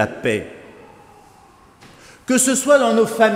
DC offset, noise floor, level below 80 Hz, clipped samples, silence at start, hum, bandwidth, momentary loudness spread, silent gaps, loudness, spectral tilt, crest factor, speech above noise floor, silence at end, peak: under 0.1%; -49 dBFS; -58 dBFS; under 0.1%; 0 s; none; 16 kHz; 17 LU; none; -16 LUFS; -3.5 dB/octave; 18 dB; 32 dB; 0 s; 0 dBFS